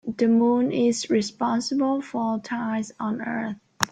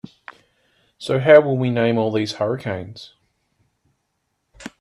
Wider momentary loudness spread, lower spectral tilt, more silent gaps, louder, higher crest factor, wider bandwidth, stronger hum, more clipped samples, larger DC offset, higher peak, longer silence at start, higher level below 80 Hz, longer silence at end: second, 9 LU vs 26 LU; second, -4.5 dB/octave vs -7 dB/octave; neither; second, -24 LUFS vs -18 LUFS; about the same, 24 dB vs 22 dB; first, 15 kHz vs 11 kHz; neither; neither; neither; about the same, 0 dBFS vs 0 dBFS; second, 0.05 s vs 1 s; about the same, -66 dBFS vs -62 dBFS; about the same, 0.05 s vs 0.1 s